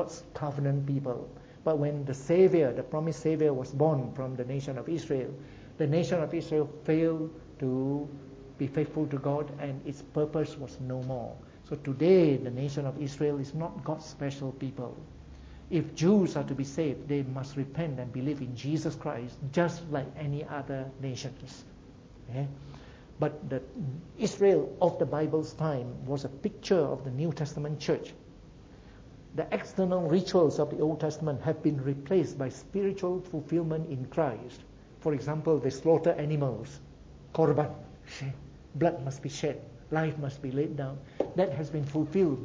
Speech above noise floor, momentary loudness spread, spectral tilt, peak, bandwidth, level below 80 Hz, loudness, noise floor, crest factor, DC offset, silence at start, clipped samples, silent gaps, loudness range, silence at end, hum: 21 dB; 14 LU; -7.5 dB/octave; -12 dBFS; 8 kHz; -58 dBFS; -31 LUFS; -51 dBFS; 20 dB; under 0.1%; 0 s; under 0.1%; none; 5 LU; 0 s; none